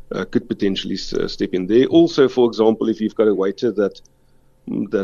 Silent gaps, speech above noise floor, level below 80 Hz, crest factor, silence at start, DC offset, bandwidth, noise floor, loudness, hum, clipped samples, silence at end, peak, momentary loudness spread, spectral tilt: none; 35 dB; -44 dBFS; 16 dB; 0.1 s; under 0.1%; 7.2 kHz; -53 dBFS; -18 LUFS; none; under 0.1%; 0 s; -2 dBFS; 10 LU; -6.5 dB/octave